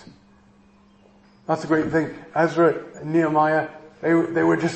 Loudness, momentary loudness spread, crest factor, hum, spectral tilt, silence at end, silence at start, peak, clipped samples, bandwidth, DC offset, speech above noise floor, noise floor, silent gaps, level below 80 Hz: -21 LUFS; 9 LU; 16 dB; none; -7 dB/octave; 0 s; 1.5 s; -6 dBFS; under 0.1%; 8.6 kHz; under 0.1%; 34 dB; -54 dBFS; none; -60 dBFS